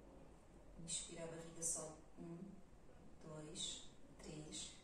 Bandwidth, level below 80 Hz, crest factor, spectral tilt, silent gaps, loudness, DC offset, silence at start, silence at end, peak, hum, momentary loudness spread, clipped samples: 14 kHz; -68 dBFS; 24 dB; -2.5 dB/octave; none; -49 LUFS; under 0.1%; 0 s; 0 s; -30 dBFS; none; 21 LU; under 0.1%